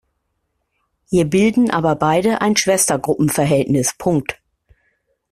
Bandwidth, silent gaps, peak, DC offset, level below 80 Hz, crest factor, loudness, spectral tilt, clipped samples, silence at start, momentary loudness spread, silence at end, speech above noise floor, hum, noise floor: 15.5 kHz; none; 0 dBFS; under 0.1%; -50 dBFS; 18 dB; -16 LUFS; -4.5 dB/octave; under 0.1%; 1.1 s; 5 LU; 1 s; 55 dB; none; -71 dBFS